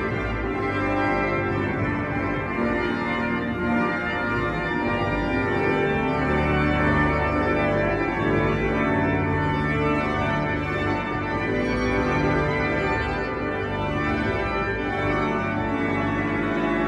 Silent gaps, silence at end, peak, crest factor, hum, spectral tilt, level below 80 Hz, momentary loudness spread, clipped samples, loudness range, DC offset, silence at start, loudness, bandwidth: none; 0 s; -8 dBFS; 14 dB; none; -7.5 dB/octave; -38 dBFS; 4 LU; under 0.1%; 3 LU; under 0.1%; 0 s; -23 LUFS; 10 kHz